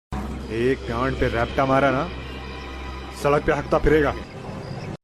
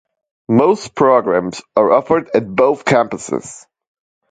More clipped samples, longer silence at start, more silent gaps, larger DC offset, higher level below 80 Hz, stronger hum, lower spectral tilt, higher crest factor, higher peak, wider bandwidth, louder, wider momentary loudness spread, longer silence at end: neither; second, 0.1 s vs 0.5 s; neither; neither; first, -34 dBFS vs -56 dBFS; neither; about the same, -6.5 dB/octave vs -6 dB/octave; about the same, 16 dB vs 16 dB; second, -6 dBFS vs 0 dBFS; first, 13.5 kHz vs 9.4 kHz; second, -23 LUFS vs -15 LUFS; first, 15 LU vs 10 LU; second, 0.05 s vs 0.7 s